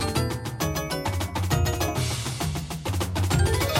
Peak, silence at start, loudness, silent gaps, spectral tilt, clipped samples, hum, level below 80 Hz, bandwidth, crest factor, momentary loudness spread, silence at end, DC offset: -10 dBFS; 0 s; -27 LUFS; none; -4.5 dB/octave; under 0.1%; none; -36 dBFS; 16.5 kHz; 16 dB; 6 LU; 0 s; under 0.1%